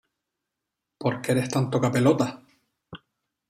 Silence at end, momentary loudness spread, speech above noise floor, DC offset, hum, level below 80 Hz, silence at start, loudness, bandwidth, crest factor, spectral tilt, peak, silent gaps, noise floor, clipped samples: 0.55 s; 8 LU; 61 dB; under 0.1%; none; -64 dBFS; 1 s; -24 LUFS; 14.5 kHz; 20 dB; -6.5 dB/octave; -8 dBFS; none; -84 dBFS; under 0.1%